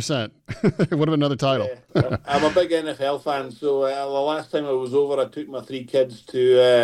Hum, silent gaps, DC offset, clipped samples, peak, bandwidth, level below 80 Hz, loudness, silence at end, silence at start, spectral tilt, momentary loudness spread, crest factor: none; none; under 0.1%; under 0.1%; -4 dBFS; 12.5 kHz; -54 dBFS; -22 LUFS; 0 s; 0 s; -6 dB/octave; 7 LU; 16 dB